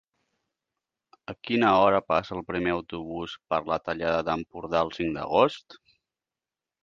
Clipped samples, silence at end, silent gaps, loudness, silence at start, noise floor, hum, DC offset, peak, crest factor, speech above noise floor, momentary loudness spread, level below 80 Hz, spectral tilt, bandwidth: under 0.1%; 1.1 s; none; -26 LUFS; 1.3 s; under -90 dBFS; none; under 0.1%; -6 dBFS; 22 dB; over 64 dB; 14 LU; -56 dBFS; -6.5 dB/octave; 7.4 kHz